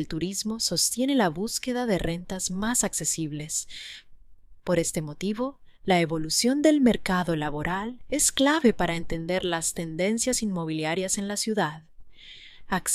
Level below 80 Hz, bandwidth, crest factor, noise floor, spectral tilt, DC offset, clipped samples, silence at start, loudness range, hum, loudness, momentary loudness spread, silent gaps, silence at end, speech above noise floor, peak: -48 dBFS; 15.5 kHz; 18 dB; -48 dBFS; -3.5 dB/octave; under 0.1%; under 0.1%; 0 s; 5 LU; none; -26 LUFS; 10 LU; none; 0 s; 22 dB; -8 dBFS